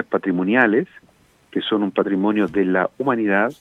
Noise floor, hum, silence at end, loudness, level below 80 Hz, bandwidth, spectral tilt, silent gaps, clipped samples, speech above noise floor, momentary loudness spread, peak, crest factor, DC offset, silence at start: -54 dBFS; none; 0.1 s; -19 LUFS; -62 dBFS; 6.4 kHz; -7.5 dB/octave; none; under 0.1%; 35 dB; 6 LU; -2 dBFS; 18 dB; under 0.1%; 0 s